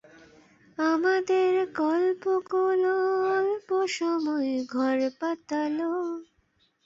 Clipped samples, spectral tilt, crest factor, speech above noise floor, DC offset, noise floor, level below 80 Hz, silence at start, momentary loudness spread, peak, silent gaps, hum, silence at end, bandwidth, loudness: under 0.1%; -4 dB/octave; 12 dB; 43 dB; under 0.1%; -69 dBFS; -74 dBFS; 0.8 s; 6 LU; -14 dBFS; none; none; 0.65 s; 7.8 kHz; -26 LUFS